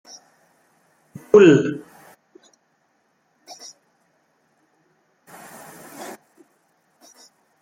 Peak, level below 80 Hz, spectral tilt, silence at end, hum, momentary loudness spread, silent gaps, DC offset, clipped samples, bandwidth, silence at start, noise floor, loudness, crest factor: -2 dBFS; -70 dBFS; -6.5 dB/octave; 1.55 s; none; 31 LU; none; under 0.1%; under 0.1%; 16 kHz; 1.35 s; -66 dBFS; -15 LUFS; 22 dB